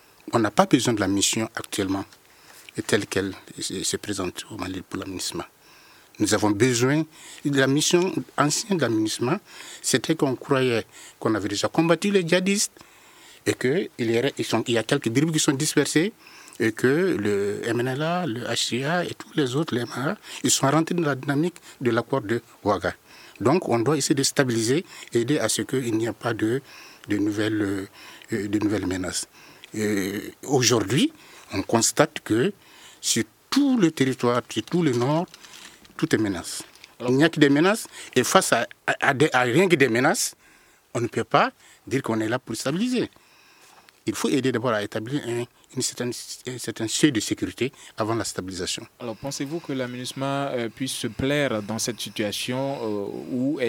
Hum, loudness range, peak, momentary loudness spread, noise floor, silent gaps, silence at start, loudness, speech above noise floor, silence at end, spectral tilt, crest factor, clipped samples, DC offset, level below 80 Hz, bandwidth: none; 5 LU; -2 dBFS; 11 LU; -56 dBFS; none; 0.25 s; -24 LUFS; 32 dB; 0 s; -4 dB/octave; 22 dB; under 0.1%; under 0.1%; -64 dBFS; 18 kHz